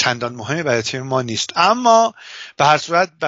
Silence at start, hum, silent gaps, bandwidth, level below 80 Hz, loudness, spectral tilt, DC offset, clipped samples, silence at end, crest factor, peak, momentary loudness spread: 0 s; none; none; 8 kHz; -62 dBFS; -17 LUFS; -2.5 dB/octave; under 0.1%; under 0.1%; 0 s; 18 dB; 0 dBFS; 10 LU